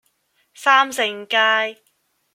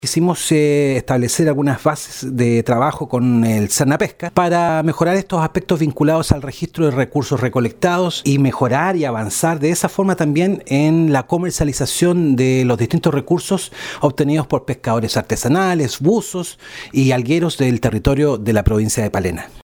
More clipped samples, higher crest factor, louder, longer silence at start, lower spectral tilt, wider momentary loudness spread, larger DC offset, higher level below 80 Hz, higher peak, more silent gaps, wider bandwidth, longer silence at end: neither; about the same, 20 dB vs 16 dB; about the same, -18 LUFS vs -17 LUFS; first, 0.6 s vs 0.05 s; second, -0.5 dB/octave vs -5.5 dB/octave; about the same, 7 LU vs 5 LU; neither; second, -76 dBFS vs -36 dBFS; about the same, -2 dBFS vs 0 dBFS; neither; second, 16.5 kHz vs over 20 kHz; first, 0.6 s vs 0.05 s